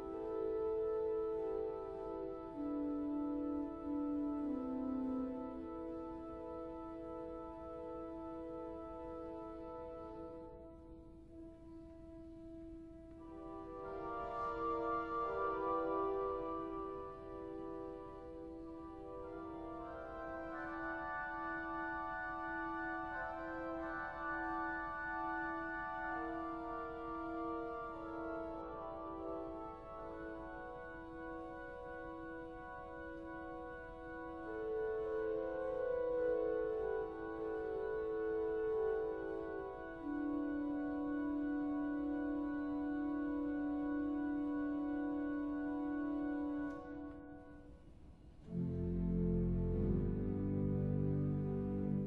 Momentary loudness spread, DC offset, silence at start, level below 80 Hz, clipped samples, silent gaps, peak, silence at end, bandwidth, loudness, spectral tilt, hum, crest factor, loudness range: 12 LU; under 0.1%; 0 s; -56 dBFS; under 0.1%; none; -26 dBFS; 0 s; 5.4 kHz; -42 LUFS; -10 dB/octave; none; 16 dB; 9 LU